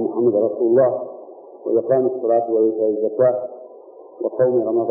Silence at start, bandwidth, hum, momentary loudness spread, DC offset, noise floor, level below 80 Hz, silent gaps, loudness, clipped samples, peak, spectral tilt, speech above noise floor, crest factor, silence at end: 0 s; 2 kHz; none; 14 LU; under 0.1%; -42 dBFS; -68 dBFS; none; -19 LUFS; under 0.1%; -4 dBFS; -15.5 dB/octave; 24 dB; 14 dB; 0 s